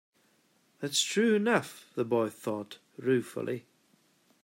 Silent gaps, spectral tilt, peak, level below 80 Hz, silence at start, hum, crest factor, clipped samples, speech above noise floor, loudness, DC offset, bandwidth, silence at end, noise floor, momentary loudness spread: none; -4 dB/octave; -14 dBFS; -80 dBFS; 0.8 s; none; 18 dB; under 0.1%; 39 dB; -30 LUFS; under 0.1%; 16 kHz; 0.85 s; -69 dBFS; 14 LU